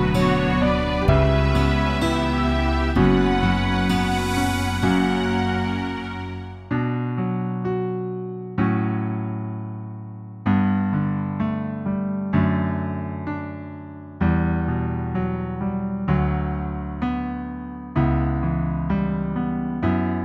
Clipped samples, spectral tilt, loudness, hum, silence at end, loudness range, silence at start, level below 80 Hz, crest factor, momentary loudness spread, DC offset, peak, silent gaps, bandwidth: under 0.1%; -7 dB/octave; -23 LUFS; none; 0 s; 6 LU; 0 s; -32 dBFS; 18 dB; 11 LU; under 0.1%; -4 dBFS; none; 13.5 kHz